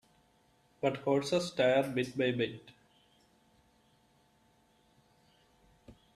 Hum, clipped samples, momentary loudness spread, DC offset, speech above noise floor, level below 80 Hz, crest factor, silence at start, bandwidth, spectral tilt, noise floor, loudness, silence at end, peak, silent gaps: none; under 0.1%; 7 LU; under 0.1%; 38 dB; -72 dBFS; 20 dB; 0.85 s; 14 kHz; -5.5 dB/octave; -69 dBFS; -32 LUFS; 0.25 s; -16 dBFS; none